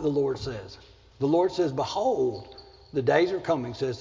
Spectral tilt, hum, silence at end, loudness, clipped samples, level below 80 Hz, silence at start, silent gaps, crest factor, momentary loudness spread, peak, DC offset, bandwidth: -6.5 dB/octave; none; 0 s; -27 LUFS; under 0.1%; -56 dBFS; 0 s; none; 18 dB; 15 LU; -8 dBFS; under 0.1%; 7.6 kHz